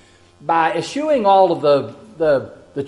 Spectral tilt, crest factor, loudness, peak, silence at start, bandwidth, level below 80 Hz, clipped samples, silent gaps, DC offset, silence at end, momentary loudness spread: -5.5 dB/octave; 16 dB; -17 LUFS; -2 dBFS; 0.45 s; 11 kHz; -58 dBFS; under 0.1%; none; under 0.1%; 0 s; 14 LU